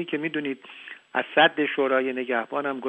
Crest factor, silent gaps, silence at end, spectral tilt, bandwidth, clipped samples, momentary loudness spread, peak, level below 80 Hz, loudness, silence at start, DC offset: 20 dB; none; 0 s; -6.5 dB/octave; 8.2 kHz; under 0.1%; 16 LU; -6 dBFS; -78 dBFS; -24 LUFS; 0 s; under 0.1%